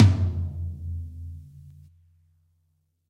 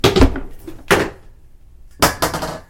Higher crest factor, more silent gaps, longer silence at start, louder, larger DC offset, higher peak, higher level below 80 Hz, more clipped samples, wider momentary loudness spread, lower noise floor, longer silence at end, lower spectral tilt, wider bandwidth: about the same, 22 dB vs 18 dB; neither; about the same, 0 s vs 0.05 s; second, -28 LUFS vs -17 LUFS; neither; second, -4 dBFS vs 0 dBFS; second, -42 dBFS vs -26 dBFS; neither; first, 24 LU vs 18 LU; first, -71 dBFS vs -42 dBFS; first, 1.4 s vs 0.1 s; first, -8 dB/octave vs -4.5 dB/octave; second, 7 kHz vs 17 kHz